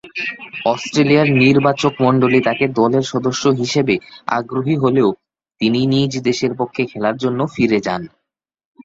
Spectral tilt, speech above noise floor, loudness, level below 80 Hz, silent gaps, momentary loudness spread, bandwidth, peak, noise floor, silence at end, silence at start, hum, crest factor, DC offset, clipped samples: -6 dB/octave; 62 dB; -16 LUFS; -54 dBFS; none; 9 LU; 7.8 kHz; -2 dBFS; -78 dBFS; 0.75 s; 0.05 s; none; 16 dB; under 0.1%; under 0.1%